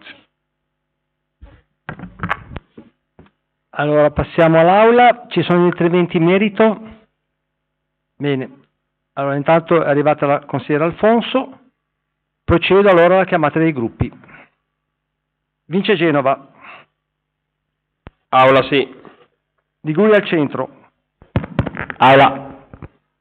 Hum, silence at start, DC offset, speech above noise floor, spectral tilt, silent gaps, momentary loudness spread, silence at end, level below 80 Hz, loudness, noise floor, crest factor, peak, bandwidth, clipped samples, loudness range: 50 Hz at -50 dBFS; 0.05 s; under 0.1%; 61 dB; -8.5 dB/octave; none; 19 LU; 0.35 s; -44 dBFS; -15 LUFS; -75 dBFS; 14 dB; -2 dBFS; 4.6 kHz; under 0.1%; 8 LU